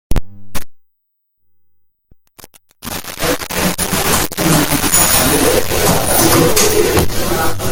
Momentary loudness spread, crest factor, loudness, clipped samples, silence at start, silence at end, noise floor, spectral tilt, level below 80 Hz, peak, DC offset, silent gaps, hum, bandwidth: 16 LU; 14 dB; -13 LUFS; under 0.1%; 0.1 s; 0 s; -67 dBFS; -3 dB/octave; -28 dBFS; 0 dBFS; under 0.1%; none; none; over 20 kHz